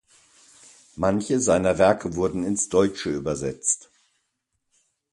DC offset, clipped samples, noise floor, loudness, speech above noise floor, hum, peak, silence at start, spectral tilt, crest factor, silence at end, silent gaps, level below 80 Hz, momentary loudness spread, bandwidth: under 0.1%; under 0.1%; -77 dBFS; -23 LUFS; 54 dB; none; -4 dBFS; 0.95 s; -4.5 dB/octave; 22 dB; 1.35 s; none; -50 dBFS; 8 LU; 11.5 kHz